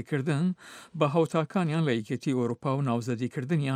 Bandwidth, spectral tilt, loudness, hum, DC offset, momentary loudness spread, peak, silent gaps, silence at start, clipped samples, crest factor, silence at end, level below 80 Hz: 12.5 kHz; -7.5 dB/octave; -28 LUFS; none; under 0.1%; 5 LU; -10 dBFS; none; 0 s; under 0.1%; 18 dB; 0 s; -76 dBFS